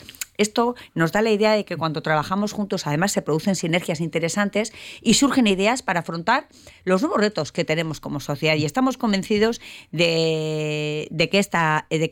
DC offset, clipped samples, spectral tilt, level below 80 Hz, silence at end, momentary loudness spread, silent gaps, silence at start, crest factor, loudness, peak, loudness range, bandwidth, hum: under 0.1%; under 0.1%; -4.5 dB/octave; -54 dBFS; 0 s; 7 LU; none; 0.1 s; 16 dB; -22 LUFS; -6 dBFS; 2 LU; 17.5 kHz; none